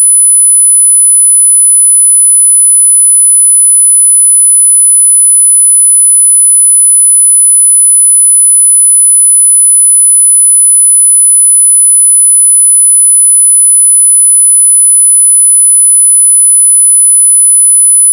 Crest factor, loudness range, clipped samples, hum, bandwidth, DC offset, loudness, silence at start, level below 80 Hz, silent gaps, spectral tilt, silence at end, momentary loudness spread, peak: 4 dB; 0 LU; 6%; none; 11 kHz; under 0.1%; 0 LUFS; 0 s; under -90 dBFS; none; 12 dB/octave; 0 s; 0 LU; 0 dBFS